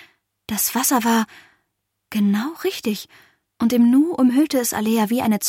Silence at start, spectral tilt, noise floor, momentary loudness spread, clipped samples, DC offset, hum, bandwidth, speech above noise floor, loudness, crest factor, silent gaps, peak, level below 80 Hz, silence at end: 0.5 s; -4 dB/octave; -75 dBFS; 11 LU; under 0.1%; under 0.1%; none; 16.5 kHz; 56 dB; -19 LUFS; 14 dB; none; -6 dBFS; -60 dBFS; 0 s